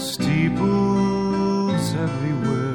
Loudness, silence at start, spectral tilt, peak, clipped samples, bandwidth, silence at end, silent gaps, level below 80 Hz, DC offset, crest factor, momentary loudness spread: -21 LUFS; 0 s; -6.5 dB/octave; -8 dBFS; under 0.1%; 17.5 kHz; 0 s; none; -46 dBFS; under 0.1%; 12 dB; 4 LU